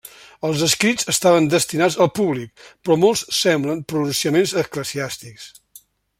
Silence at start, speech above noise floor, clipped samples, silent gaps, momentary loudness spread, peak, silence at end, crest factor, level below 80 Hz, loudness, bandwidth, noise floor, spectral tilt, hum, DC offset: 0.05 s; 31 dB; under 0.1%; none; 14 LU; -2 dBFS; 0.7 s; 18 dB; -58 dBFS; -19 LUFS; 16.5 kHz; -50 dBFS; -4 dB/octave; none; under 0.1%